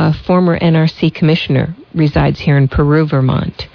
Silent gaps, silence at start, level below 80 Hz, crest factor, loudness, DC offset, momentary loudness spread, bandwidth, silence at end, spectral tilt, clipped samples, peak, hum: none; 0 s; -30 dBFS; 10 dB; -13 LUFS; under 0.1%; 4 LU; 5.4 kHz; 0.1 s; -9 dB/octave; under 0.1%; -2 dBFS; none